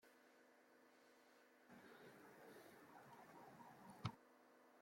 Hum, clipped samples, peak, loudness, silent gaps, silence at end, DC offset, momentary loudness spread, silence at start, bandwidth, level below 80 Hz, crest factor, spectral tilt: none; under 0.1%; -30 dBFS; -61 LUFS; none; 0 s; under 0.1%; 11 LU; 0 s; 16.5 kHz; -88 dBFS; 32 dB; -5.5 dB/octave